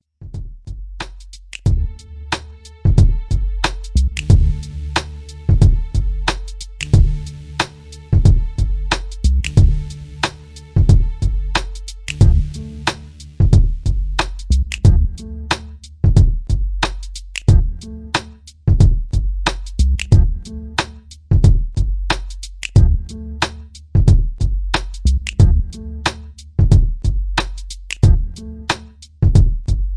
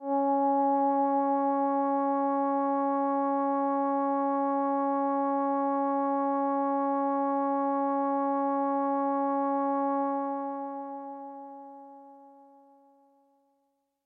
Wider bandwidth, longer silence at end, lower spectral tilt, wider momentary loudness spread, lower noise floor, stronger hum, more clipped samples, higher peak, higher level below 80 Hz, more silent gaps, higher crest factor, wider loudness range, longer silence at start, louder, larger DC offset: first, 11 kHz vs 2.9 kHz; second, 0 s vs 1.75 s; second, -5.5 dB/octave vs -9 dB/octave; first, 17 LU vs 11 LU; second, -36 dBFS vs -76 dBFS; neither; neither; first, 0 dBFS vs -18 dBFS; first, -18 dBFS vs under -90 dBFS; neither; about the same, 16 dB vs 12 dB; second, 2 LU vs 9 LU; first, 0.2 s vs 0 s; first, -18 LUFS vs -28 LUFS; neither